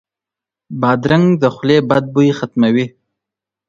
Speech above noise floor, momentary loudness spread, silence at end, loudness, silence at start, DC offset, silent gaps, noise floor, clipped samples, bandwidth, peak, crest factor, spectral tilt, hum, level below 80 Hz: 73 dB; 6 LU; 0.8 s; -14 LUFS; 0.7 s; under 0.1%; none; -86 dBFS; under 0.1%; 7.4 kHz; 0 dBFS; 16 dB; -7.5 dB/octave; none; -52 dBFS